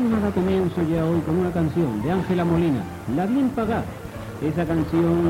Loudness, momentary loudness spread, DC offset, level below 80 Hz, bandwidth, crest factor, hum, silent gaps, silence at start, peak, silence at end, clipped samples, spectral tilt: -23 LUFS; 7 LU; under 0.1%; -42 dBFS; 16 kHz; 14 dB; none; none; 0 s; -8 dBFS; 0 s; under 0.1%; -8.5 dB/octave